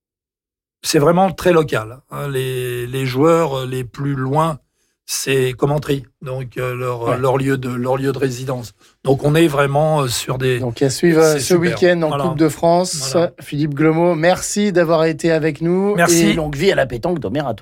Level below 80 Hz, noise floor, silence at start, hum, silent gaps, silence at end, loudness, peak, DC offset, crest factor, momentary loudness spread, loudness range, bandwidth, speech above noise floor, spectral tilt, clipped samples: -46 dBFS; -90 dBFS; 0.85 s; none; none; 0 s; -17 LUFS; -2 dBFS; under 0.1%; 14 dB; 10 LU; 5 LU; 17 kHz; 74 dB; -5.5 dB/octave; under 0.1%